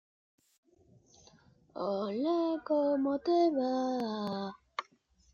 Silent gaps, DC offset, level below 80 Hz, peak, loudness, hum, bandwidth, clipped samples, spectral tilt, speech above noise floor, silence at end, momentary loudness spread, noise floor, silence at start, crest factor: none; under 0.1%; -76 dBFS; -18 dBFS; -32 LUFS; none; 7 kHz; under 0.1%; -6.5 dB/octave; 37 dB; 0.5 s; 14 LU; -68 dBFS; 1.75 s; 16 dB